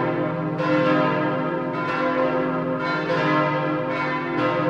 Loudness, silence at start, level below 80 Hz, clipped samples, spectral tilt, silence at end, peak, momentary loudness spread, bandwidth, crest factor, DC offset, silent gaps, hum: -22 LUFS; 0 s; -58 dBFS; under 0.1%; -7.5 dB/octave; 0 s; -8 dBFS; 5 LU; 7.6 kHz; 14 dB; under 0.1%; none; none